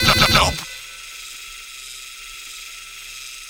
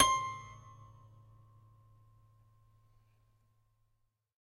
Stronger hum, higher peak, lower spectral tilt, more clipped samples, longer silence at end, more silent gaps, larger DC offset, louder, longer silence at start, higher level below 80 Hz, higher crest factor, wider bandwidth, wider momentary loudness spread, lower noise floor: neither; first, 0 dBFS vs -10 dBFS; about the same, -2.5 dB/octave vs -1.5 dB/octave; neither; second, 0 s vs 3.7 s; neither; neither; first, -16 LUFS vs -34 LUFS; about the same, 0 s vs 0 s; first, -36 dBFS vs -66 dBFS; second, 22 dB vs 32 dB; first, over 20 kHz vs 15.5 kHz; second, 20 LU vs 28 LU; second, -36 dBFS vs -79 dBFS